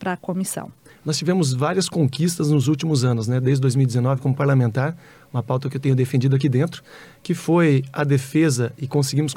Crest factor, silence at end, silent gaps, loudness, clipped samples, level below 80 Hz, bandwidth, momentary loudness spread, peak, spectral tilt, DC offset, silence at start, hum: 12 dB; 0 s; none; -21 LUFS; under 0.1%; -62 dBFS; 15.5 kHz; 9 LU; -8 dBFS; -6 dB/octave; under 0.1%; 0 s; none